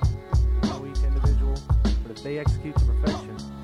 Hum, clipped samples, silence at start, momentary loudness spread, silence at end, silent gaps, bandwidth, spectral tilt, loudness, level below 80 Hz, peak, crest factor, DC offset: none; under 0.1%; 0 s; 6 LU; 0 s; none; 9.2 kHz; -7.5 dB/octave; -25 LUFS; -24 dBFS; -10 dBFS; 12 dB; under 0.1%